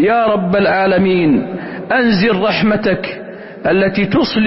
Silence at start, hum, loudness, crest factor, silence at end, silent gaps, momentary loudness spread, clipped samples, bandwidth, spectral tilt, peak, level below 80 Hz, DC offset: 0 s; none; -14 LUFS; 10 dB; 0 s; none; 12 LU; under 0.1%; 5.8 kHz; -10 dB/octave; -4 dBFS; -44 dBFS; under 0.1%